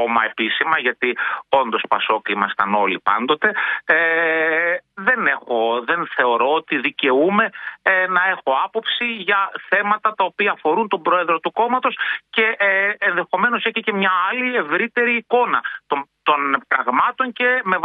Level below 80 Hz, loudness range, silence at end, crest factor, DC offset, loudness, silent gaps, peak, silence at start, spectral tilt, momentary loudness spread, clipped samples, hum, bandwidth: -70 dBFS; 1 LU; 0 s; 18 dB; under 0.1%; -18 LUFS; none; 0 dBFS; 0 s; -7 dB/octave; 4 LU; under 0.1%; none; 4.7 kHz